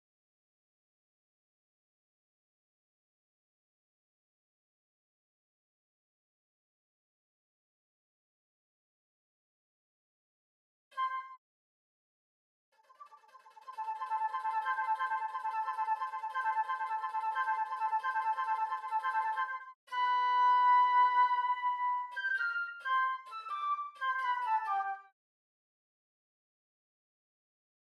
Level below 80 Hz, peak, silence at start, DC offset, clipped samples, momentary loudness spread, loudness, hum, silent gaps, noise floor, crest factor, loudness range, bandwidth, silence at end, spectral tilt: under -90 dBFS; -20 dBFS; 10.95 s; under 0.1%; under 0.1%; 13 LU; -33 LUFS; none; 11.38-12.72 s, 19.75-19.87 s; -59 dBFS; 16 dB; 16 LU; 11.5 kHz; 2.95 s; 2.5 dB/octave